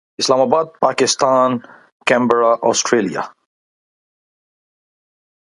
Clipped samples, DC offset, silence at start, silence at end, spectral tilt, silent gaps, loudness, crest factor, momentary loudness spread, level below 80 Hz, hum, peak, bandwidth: under 0.1%; under 0.1%; 0.2 s; 2.2 s; -3 dB/octave; 1.92-2.00 s; -16 LUFS; 18 dB; 9 LU; -64 dBFS; none; 0 dBFS; 11.5 kHz